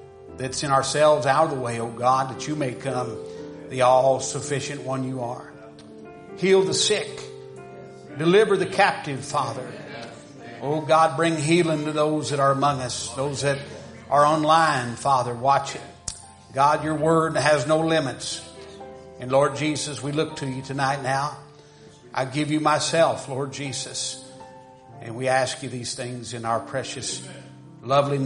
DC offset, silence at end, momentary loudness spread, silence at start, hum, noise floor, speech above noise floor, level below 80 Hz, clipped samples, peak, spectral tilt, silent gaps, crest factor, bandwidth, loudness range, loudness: under 0.1%; 0 s; 21 LU; 0 s; none; -48 dBFS; 26 dB; -60 dBFS; under 0.1%; -4 dBFS; -4.5 dB/octave; none; 20 dB; 10.5 kHz; 4 LU; -23 LUFS